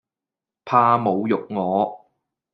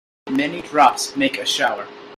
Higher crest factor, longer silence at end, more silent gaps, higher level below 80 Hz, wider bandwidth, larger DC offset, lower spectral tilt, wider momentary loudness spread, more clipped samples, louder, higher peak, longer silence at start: about the same, 20 dB vs 20 dB; first, 0.55 s vs 0 s; neither; second, -72 dBFS vs -62 dBFS; second, 6.2 kHz vs 15.5 kHz; neither; first, -9 dB/octave vs -2.5 dB/octave; about the same, 7 LU vs 8 LU; neither; about the same, -20 LUFS vs -19 LUFS; about the same, -2 dBFS vs 0 dBFS; first, 0.65 s vs 0.25 s